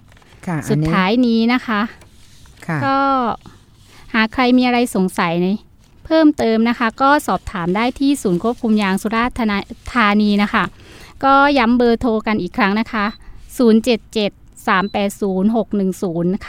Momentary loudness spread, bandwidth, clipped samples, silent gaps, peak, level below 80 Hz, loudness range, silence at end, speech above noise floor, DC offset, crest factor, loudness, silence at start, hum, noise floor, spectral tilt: 9 LU; 16 kHz; under 0.1%; none; 0 dBFS; -42 dBFS; 3 LU; 0 s; 28 dB; under 0.1%; 16 dB; -17 LUFS; 0.45 s; none; -44 dBFS; -6 dB/octave